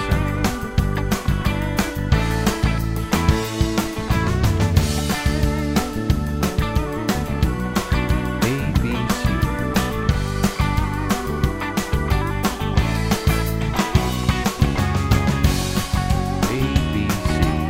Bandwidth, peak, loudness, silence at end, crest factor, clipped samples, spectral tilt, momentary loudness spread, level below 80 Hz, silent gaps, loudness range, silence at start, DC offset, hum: 16.5 kHz; -2 dBFS; -21 LUFS; 0 s; 18 dB; under 0.1%; -5.5 dB/octave; 4 LU; -26 dBFS; none; 2 LU; 0 s; under 0.1%; none